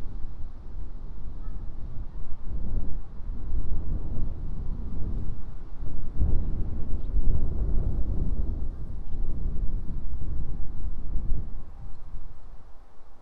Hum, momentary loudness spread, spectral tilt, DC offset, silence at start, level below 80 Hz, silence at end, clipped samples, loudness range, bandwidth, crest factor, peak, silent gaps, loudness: none; 13 LU; -10.5 dB/octave; under 0.1%; 0 s; -28 dBFS; 0.05 s; under 0.1%; 7 LU; 1.4 kHz; 14 dB; -6 dBFS; none; -36 LUFS